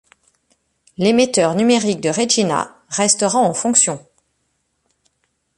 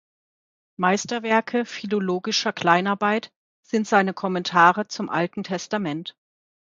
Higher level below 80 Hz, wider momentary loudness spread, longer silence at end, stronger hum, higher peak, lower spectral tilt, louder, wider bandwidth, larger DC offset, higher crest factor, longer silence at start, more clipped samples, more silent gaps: first, -60 dBFS vs -72 dBFS; second, 6 LU vs 10 LU; first, 1.6 s vs 0.6 s; neither; about the same, 0 dBFS vs -2 dBFS; second, -3 dB/octave vs -4.5 dB/octave; first, -16 LUFS vs -22 LUFS; first, 11.5 kHz vs 7.8 kHz; neither; about the same, 18 dB vs 22 dB; first, 1 s vs 0.8 s; neither; second, none vs 3.36-3.63 s